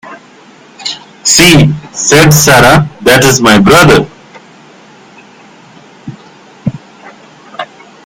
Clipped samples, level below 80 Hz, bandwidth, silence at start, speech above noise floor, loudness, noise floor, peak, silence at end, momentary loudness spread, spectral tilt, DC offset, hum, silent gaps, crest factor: 2%; -32 dBFS; over 20 kHz; 0.05 s; 33 dB; -5 LUFS; -37 dBFS; 0 dBFS; 0.4 s; 21 LU; -4 dB/octave; under 0.1%; none; none; 10 dB